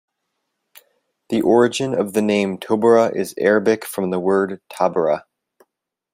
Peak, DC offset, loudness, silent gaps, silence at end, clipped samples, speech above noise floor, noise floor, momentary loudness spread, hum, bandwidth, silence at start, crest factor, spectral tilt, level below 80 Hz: -2 dBFS; under 0.1%; -18 LUFS; none; 0.95 s; under 0.1%; 58 dB; -76 dBFS; 7 LU; none; 16 kHz; 1.3 s; 18 dB; -5.5 dB/octave; -64 dBFS